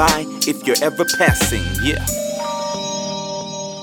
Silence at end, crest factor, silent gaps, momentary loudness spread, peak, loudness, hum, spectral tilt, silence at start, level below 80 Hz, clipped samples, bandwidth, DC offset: 0 s; 18 dB; none; 10 LU; 0 dBFS; -19 LUFS; none; -3.5 dB/octave; 0 s; -34 dBFS; under 0.1%; 19 kHz; under 0.1%